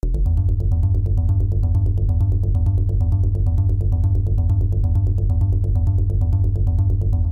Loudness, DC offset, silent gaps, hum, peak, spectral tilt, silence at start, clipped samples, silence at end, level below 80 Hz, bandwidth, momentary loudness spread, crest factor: -20 LUFS; under 0.1%; none; none; -8 dBFS; -11.5 dB/octave; 0.05 s; under 0.1%; 0 s; -20 dBFS; 1.2 kHz; 1 LU; 8 dB